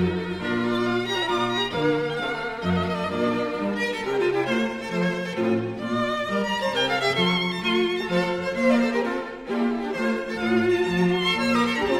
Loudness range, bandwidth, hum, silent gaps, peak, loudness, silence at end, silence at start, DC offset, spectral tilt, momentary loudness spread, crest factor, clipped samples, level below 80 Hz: 2 LU; 15 kHz; none; none; -8 dBFS; -24 LUFS; 0 s; 0 s; under 0.1%; -5.5 dB/octave; 5 LU; 14 dB; under 0.1%; -52 dBFS